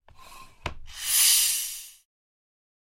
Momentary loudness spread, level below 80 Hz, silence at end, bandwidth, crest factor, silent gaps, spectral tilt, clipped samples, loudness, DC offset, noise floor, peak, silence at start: 21 LU; -50 dBFS; 1.1 s; 16.5 kHz; 22 dB; none; 2 dB/octave; under 0.1%; -21 LUFS; under 0.1%; -48 dBFS; -8 dBFS; 0.2 s